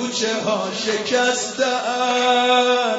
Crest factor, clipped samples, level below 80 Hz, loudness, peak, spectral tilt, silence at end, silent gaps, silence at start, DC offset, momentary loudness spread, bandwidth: 14 dB; under 0.1%; -68 dBFS; -19 LUFS; -4 dBFS; -2 dB/octave; 0 s; none; 0 s; under 0.1%; 7 LU; 8 kHz